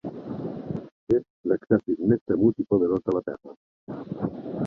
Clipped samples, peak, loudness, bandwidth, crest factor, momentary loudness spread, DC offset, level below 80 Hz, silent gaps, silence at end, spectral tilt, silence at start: under 0.1%; -6 dBFS; -26 LUFS; 5.2 kHz; 20 dB; 14 LU; under 0.1%; -58 dBFS; 0.92-1.07 s, 1.30-1.44 s, 2.21-2.26 s, 3.57-3.87 s; 0 s; -11 dB/octave; 0.05 s